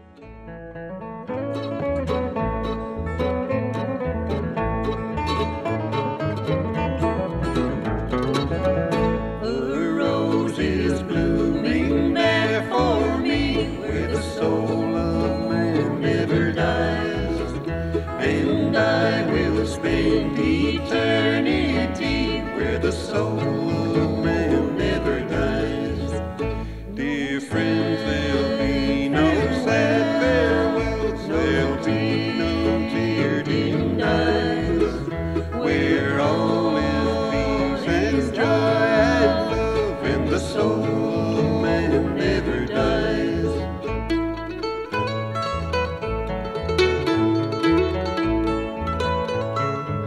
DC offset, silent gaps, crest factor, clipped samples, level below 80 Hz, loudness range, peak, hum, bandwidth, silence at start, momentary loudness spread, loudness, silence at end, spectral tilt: 0.1%; none; 16 dB; under 0.1%; -36 dBFS; 5 LU; -6 dBFS; none; 12 kHz; 0.15 s; 7 LU; -22 LUFS; 0 s; -6.5 dB/octave